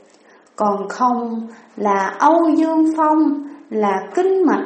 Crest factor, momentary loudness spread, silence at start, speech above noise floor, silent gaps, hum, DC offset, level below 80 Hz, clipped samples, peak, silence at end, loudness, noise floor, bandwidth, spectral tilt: 16 dB; 12 LU; 0.6 s; 33 dB; none; none; under 0.1%; -72 dBFS; under 0.1%; -2 dBFS; 0 s; -17 LUFS; -50 dBFS; 8.6 kHz; -6.5 dB/octave